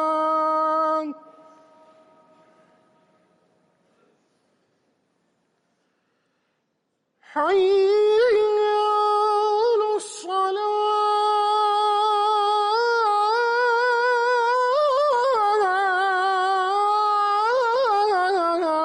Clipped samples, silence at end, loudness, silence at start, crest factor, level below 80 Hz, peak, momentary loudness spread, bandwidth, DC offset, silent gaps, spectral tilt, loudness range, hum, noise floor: under 0.1%; 0 s; -20 LUFS; 0 s; 10 dB; -72 dBFS; -12 dBFS; 4 LU; 11 kHz; under 0.1%; none; -1.5 dB/octave; 7 LU; none; -74 dBFS